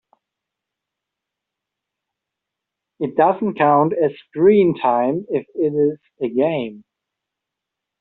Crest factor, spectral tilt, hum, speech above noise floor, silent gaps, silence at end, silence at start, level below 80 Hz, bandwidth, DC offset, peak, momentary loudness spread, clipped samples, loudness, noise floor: 18 dB; -6.5 dB/octave; none; 66 dB; none; 1.2 s; 3 s; -64 dBFS; 4.1 kHz; under 0.1%; -2 dBFS; 10 LU; under 0.1%; -18 LUFS; -83 dBFS